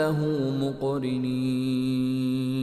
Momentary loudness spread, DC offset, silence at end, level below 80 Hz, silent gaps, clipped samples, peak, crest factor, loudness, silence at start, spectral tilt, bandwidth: 2 LU; under 0.1%; 0 s; -58 dBFS; none; under 0.1%; -14 dBFS; 12 dB; -27 LUFS; 0 s; -7.5 dB/octave; 13 kHz